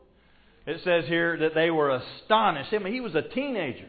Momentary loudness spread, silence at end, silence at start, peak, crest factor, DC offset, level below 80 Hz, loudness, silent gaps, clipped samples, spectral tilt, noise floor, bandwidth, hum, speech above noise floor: 8 LU; 0 s; 0.65 s; -10 dBFS; 18 dB; under 0.1%; -62 dBFS; -26 LUFS; none; under 0.1%; -9.5 dB/octave; -58 dBFS; 4.8 kHz; none; 33 dB